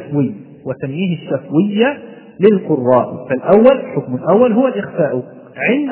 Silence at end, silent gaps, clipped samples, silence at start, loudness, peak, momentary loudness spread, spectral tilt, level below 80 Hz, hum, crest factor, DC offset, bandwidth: 0 s; none; 0.2%; 0 s; -15 LUFS; 0 dBFS; 13 LU; -11.5 dB/octave; -58 dBFS; none; 14 dB; under 0.1%; 4 kHz